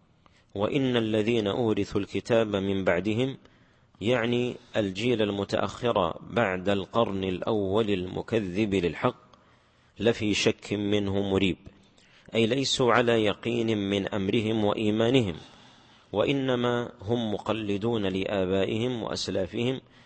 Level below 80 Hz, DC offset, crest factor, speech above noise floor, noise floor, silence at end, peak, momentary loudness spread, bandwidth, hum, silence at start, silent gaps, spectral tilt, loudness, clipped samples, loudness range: -58 dBFS; under 0.1%; 20 dB; 34 dB; -61 dBFS; 0.25 s; -6 dBFS; 6 LU; 8.8 kHz; none; 0.55 s; none; -5.5 dB/octave; -27 LUFS; under 0.1%; 3 LU